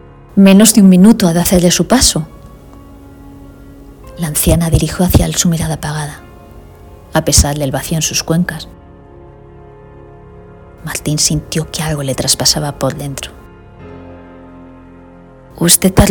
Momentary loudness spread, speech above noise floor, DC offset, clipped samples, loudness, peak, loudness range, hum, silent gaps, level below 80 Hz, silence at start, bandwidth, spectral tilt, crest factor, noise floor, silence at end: 20 LU; 27 dB; under 0.1%; 0.8%; -11 LUFS; 0 dBFS; 9 LU; none; none; -28 dBFS; 0.35 s; over 20 kHz; -4.5 dB/octave; 14 dB; -38 dBFS; 0 s